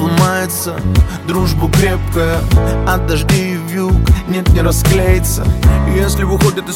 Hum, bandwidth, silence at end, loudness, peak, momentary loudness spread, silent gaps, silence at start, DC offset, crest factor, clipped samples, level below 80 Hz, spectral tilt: none; 17 kHz; 0 s; -13 LUFS; 0 dBFS; 4 LU; none; 0 s; under 0.1%; 12 dB; under 0.1%; -16 dBFS; -5.5 dB/octave